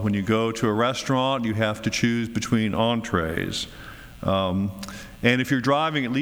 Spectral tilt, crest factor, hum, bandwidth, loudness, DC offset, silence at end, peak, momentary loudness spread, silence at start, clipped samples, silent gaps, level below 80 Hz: -5.5 dB/octave; 18 dB; none; over 20 kHz; -24 LUFS; under 0.1%; 0 s; -6 dBFS; 9 LU; 0 s; under 0.1%; none; -48 dBFS